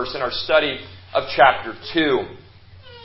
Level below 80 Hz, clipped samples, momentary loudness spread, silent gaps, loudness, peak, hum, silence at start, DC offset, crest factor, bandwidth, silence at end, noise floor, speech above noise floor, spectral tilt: -48 dBFS; under 0.1%; 12 LU; none; -19 LUFS; -2 dBFS; none; 0 s; under 0.1%; 20 dB; 5.8 kHz; 0 s; -44 dBFS; 25 dB; -8 dB/octave